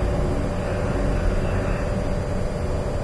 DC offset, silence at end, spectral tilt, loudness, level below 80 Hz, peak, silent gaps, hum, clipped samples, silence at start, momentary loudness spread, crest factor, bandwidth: under 0.1%; 0 s; -7 dB/octave; -25 LUFS; -26 dBFS; -10 dBFS; none; none; under 0.1%; 0 s; 3 LU; 14 dB; 11 kHz